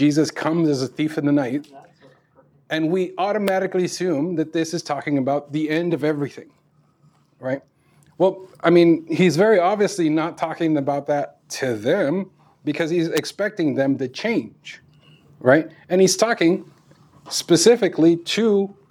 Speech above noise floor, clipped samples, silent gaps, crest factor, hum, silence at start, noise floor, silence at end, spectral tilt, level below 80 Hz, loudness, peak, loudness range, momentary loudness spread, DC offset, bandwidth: 39 dB; under 0.1%; none; 20 dB; none; 0 s; -59 dBFS; 0.2 s; -5 dB/octave; -74 dBFS; -20 LUFS; -2 dBFS; 6 LU; 11 LU; under 0.1%; 17 kHz